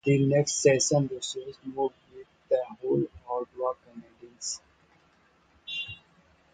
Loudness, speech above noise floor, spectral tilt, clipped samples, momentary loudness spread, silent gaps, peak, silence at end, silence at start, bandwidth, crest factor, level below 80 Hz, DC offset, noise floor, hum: -28 LUFS; 38 dB; -4.5 dB/octave; under 0.1%; 16 LU; none; -8 dBFS; 0.6 s; 0.05 s; 9.4 kHz; 20 dB; -64 dBFS; under 0.1%; -64 dBFS; none